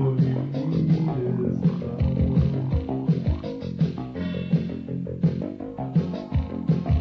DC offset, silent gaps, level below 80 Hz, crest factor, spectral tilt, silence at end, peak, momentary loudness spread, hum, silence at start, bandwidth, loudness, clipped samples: under 0.1%; none; -36 dBFS; 14 dB; -10.5 dB/octave; 0 s; -10 dBFS; 8 LU; none; 0 s; 6 kHz; -25 LUFS; under 0.1%